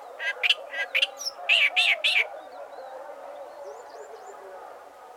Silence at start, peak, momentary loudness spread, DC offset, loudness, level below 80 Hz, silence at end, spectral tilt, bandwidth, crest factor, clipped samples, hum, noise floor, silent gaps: 0 s; -8 dBFS; 23 LU; under 0.1%; -22 LUFS; -84 dBFS; 0 s; 3 dB/octave; 19.5 kHz; 20 dB; under 0.1%; none; -46 dBFS; none